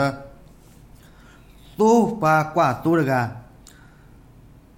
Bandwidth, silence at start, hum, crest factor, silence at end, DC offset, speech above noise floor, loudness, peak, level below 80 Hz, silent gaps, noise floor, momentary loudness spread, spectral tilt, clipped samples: 16.5 kHz; 0 s; none; 18 dB; 1.35 s; under 0.1%; 29 dB; -20 LUFS; -6 dBFS; -52 dBFS; none; -48 dBFS; 21 LU; -6.5 dB/octave; under 0.1%